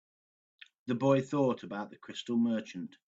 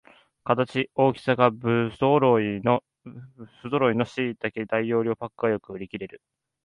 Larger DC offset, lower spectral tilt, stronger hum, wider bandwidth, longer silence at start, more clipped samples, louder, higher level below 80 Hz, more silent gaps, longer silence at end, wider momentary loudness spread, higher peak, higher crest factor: neither; about the same, -7 dB/octave vs -8 dB/octave; neither; second, 7.8 kHz vs 10.5 kHz; first, 0.85 s vs 0.45 s; neither; second, -32 LUFS vs -24 LUFS; second, -76 dBFS vs -62 dBFS; neither; second, 0.2 s vs 0.45 s; about the same, 14 LU vs 16 LU; second, -14 dBFS vs -4 dBFS; about the same, 20 dB vs 22 dB